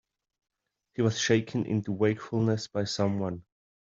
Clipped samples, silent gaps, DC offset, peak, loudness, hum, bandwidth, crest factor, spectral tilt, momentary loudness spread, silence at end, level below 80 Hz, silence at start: under 0.1%; none; under 0.1%; -8 dBFS; -29 LUFS; none; 7.6 kHz; 22 dB; -5.5 dB/octave; 8 LU; 0.55 s; -68 dBFS; 1 s